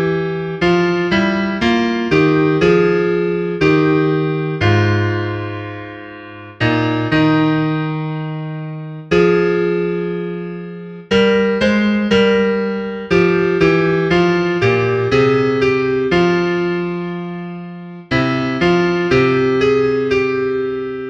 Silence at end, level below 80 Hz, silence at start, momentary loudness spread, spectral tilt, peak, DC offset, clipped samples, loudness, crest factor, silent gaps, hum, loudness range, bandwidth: 0 s; -42 dBFS; 0 s; 13 LU; -7 dB/octave; 0 dBFS; under 0.1%; under 0.1%; -15 LUFS; 14 dB; none; none; 4 LU; 8 kHz